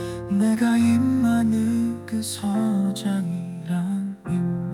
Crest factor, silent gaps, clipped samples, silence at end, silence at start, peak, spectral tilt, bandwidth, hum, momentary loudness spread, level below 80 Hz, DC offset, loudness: 12 dB; none; under 0.1%; 0 s; 0 s; -10 dBFS; -6.5 dB/octave; 15.5 kHz; none; 9 LU; -56 dBFS; under 0.1%; -23 LUFS